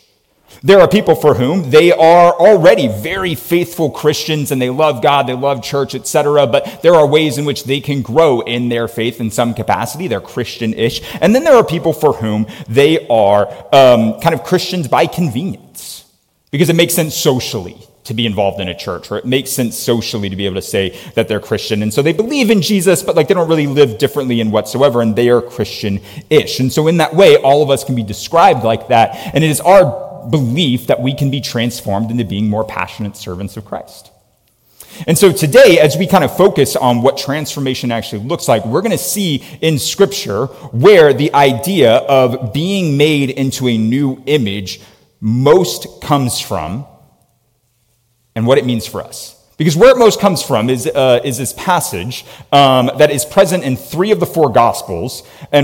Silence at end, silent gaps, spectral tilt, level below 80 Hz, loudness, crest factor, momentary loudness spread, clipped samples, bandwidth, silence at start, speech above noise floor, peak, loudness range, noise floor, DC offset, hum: 0 s; none; -5 dB/octave; -48 dBFS; -12 LUFS; 12 dB; 13 LU; under 0.1%; 17 kHz; 0.65 s; 47 dB; 0 dBFS; 6 LU; -60 dBFS; under 0.1%; none